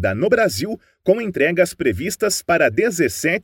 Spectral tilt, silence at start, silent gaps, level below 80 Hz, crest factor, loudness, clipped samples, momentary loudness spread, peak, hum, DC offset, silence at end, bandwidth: -4.5 dB/octave; 0 s; none; -48 dBFS; 16 dB; -19 LUFS; under 0.1%; 5 LU; -2 dBFS; none; under 0.1%; 0.05 s; 17 kHz